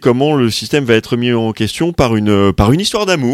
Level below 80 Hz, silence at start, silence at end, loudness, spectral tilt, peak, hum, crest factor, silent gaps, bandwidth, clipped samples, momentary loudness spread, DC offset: -30 dBFS; 0 s; 0 s; -13 LUFS; -5.5 dB/octave; 0 dBFS; none; 12 dB; none; 15.5 kHz; under 0.1%; 4 LU; under 0.1%